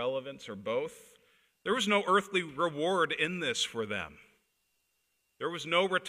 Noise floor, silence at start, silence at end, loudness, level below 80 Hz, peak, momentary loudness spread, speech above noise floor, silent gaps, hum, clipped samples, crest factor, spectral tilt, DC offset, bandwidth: -78 dBFS; 0 s; 0 s; -31 LUFS; -72 dBFS; -14 dBFS; 13 LU; 46 dB; none; none; under 0.1%; 20 dB; -3.5 dB/octave; under 0.1%; 15.5 kHz